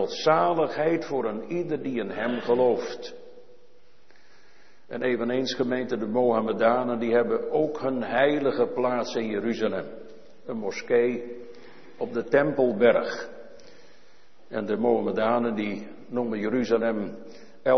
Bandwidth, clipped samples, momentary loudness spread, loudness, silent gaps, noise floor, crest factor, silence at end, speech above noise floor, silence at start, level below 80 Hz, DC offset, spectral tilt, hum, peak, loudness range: 6.4 kHz; under 0.1%; 14 LU; -26 LUFS; none; -60 dBFS; 20 dB; 0 s; 35 dB; 0 s; -68 dBFS; 0.7%; -6 dB/octave; none; -6 dBFS; 5 LU